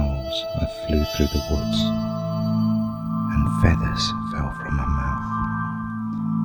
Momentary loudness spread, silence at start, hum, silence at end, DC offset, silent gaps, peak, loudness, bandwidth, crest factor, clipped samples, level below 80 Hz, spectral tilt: 7 LU; 0 s; none; 0 s; under 0.1%; none; -4 dBFS; -24 LUFS; over 20 kHz; 18 dB; under 0.1%; -30 dBFS; -6.5 dB/octave